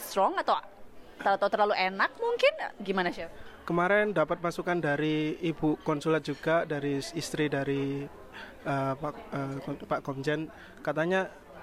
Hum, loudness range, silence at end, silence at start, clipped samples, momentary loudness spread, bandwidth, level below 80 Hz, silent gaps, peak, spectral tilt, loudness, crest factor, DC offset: none; 5 LU; 0 s; 0 s; under 0.1%; 12 LU; 16 kHz; -58 dBFS; none; -12 dBFS; -5.5 dB/octave; -30 LUFS; 18 dB; under 0.1%